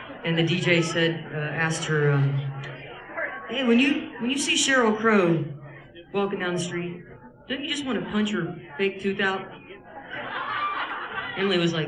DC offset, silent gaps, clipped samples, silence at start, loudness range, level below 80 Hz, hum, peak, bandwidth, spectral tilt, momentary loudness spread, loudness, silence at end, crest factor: under 0.1%; none; under 0.1%; 0 s; 6 LU; -60 dBFS; none; -8 dBFS; 12 kHz; -4.5 dB/octave; 16 LU; -25 LUFS; 0 s; 18 dB